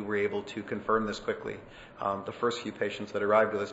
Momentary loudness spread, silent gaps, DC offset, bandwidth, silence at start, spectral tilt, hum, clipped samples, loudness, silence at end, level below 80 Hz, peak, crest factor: 11 LU; none; under 0.1%; 8 kHz; 0 s; -5 dB/octave; none; under 0.1%; -31 LUFS; 0 s; -60 dBFS; -12 dBFS; 20 dB